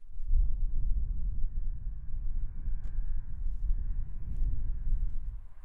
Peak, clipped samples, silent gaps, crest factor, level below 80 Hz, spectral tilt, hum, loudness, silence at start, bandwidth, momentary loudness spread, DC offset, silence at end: -16 dBFS; under 0.1%; none; 12 dB; -30 dBFS; -10 dB/octave; none; -39 LUFS; 0 s; 0.5 kHz; 7 LU; under 0.1%; 0.05 s